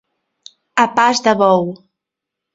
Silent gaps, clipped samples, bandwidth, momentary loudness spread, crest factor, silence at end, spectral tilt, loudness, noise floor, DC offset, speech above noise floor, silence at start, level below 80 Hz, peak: none; under 0.1%; 8 kHz; 8 LU; 18 dB; 0.8 s; -4 dB/octave; -14 LUFS; -82 dBFS; under 0.1%; 68 dB; 0.75 s; -62 dBFS; 0 dBFS